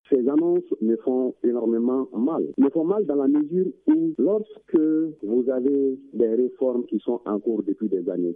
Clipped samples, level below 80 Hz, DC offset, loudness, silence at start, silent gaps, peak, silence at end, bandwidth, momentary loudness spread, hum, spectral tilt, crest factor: under 0.1%; -72 dBFS; under 0.1%; -23 LUFS; 0.1 s; none; -8 dBFS; 0 s; 3.7 kHz; 5 LU; none; -12 dB/octave; 16 dB